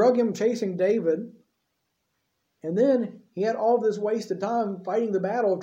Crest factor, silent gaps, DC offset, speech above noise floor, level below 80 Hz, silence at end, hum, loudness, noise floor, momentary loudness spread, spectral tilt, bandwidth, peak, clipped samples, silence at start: 16 dB; none; under 0.1%; 52 dB; -80 dBFS; 0 s; none; -25 LUFS; -77 dBFS; 8 LU; -7 dB/octave; 8.4 kHz; -10 dBFS; under 0.1%; 0 s